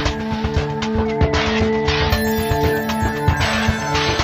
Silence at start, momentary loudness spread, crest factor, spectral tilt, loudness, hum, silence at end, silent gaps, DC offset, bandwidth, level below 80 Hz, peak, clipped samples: 0 s; 4 LU; 16 dB; -5 dB/octave; -19 LUFS; none; 0 s; none; under 0.1%; 15.5 kHz; -28 dBFS; -2 dBFS; under 0.1%